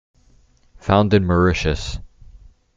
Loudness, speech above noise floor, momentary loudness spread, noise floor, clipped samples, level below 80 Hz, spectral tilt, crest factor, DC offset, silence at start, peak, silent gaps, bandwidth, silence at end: -18 LUFS; 37 dB; 15 LU; -54 dBFS; under 0.1%; -34 dBFS; -6.5 dB/octave; 18 dB; under 0.1%; 0.85 s; -2 dBFS; none; 7.8 kHz; 0.7 s